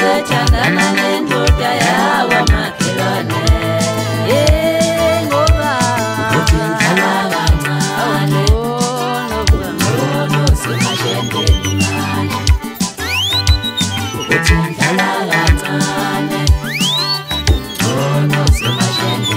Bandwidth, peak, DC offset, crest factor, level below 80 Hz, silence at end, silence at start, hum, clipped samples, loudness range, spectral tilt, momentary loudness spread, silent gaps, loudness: 16.5 kHz; 0 dBFS; under 0.1%; 14 dB; -20 dBFS; 0 s; 0 s; none; under 0.1%; 2 LU; -4.5 dB/octave; 4 LU; none; -14 LUFS